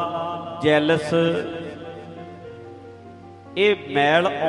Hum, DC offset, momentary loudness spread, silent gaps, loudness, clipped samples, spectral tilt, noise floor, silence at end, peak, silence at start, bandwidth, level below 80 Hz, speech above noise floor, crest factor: none; under 0.1%; 23 LU; none; -21 LUFS; under 0.1%; -6 dB/octave; -42 dBFS; 0 s; -6 dBFS; 0 s; 11.5 kHz; -62 dBFS; 23 dB; 18 dB